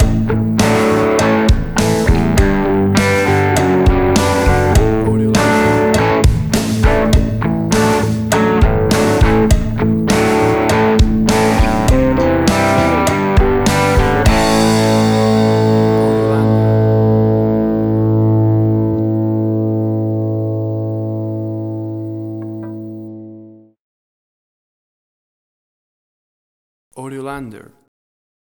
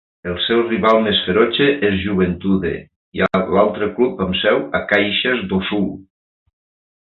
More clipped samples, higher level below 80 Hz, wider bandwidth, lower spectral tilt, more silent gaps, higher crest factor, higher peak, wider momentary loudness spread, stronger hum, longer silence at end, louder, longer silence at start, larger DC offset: neither; first, -22 dBFS vs -42 dBFS; first, over 20 kHz vs 5.8 kHz; second, -6 dB/octave vs -8 dB/octave; first, 23.79-26.91 s vs 2.96-3.12 s; about the same, 12 dB vs 16 dB; about the same, 0 dBFS vs -2 dBFS; first, 11 LU vs 8 LU; neither; about the same, 0.95 s vs 1 s; first, -13 LUFS vs -17 LUFS; second, 0 s vs 0.25 s; neither